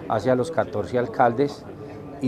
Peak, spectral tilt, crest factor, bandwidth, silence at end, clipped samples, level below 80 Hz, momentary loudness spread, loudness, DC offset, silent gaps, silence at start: -4 dBFS; -7 dB/octave; 20 dB; 13.5 kHz; 0 s; under 0.1%; -52 dBFS; 17 LU; -23 LUFS; under 0.1%; none; 0 s